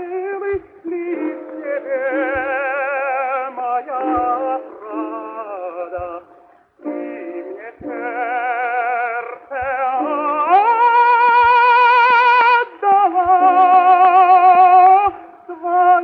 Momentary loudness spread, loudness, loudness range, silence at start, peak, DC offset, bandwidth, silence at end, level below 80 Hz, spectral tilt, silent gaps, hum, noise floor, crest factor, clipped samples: 18 LU; -14 LUFS; 15 LU; 0 s; -2 dBFS; under 0.1%; 5.2 kHz; 0 s; -54 dBFS; -5.5 dB/octave; none; none; -49 dBFS; 14 dB; under 0.1%